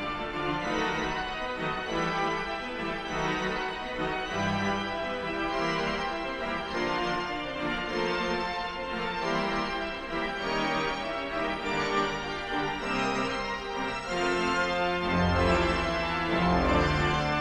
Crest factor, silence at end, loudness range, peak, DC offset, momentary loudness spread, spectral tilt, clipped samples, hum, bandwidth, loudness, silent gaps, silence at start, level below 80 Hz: 16 dB; 0 s; 4 LU; -12 dBFS; under 0.1%; 7 LU; -5 dB/octave; under 0.1%; none; 12 kHz; -29 LUFS; none; 0 s; -44 dBFS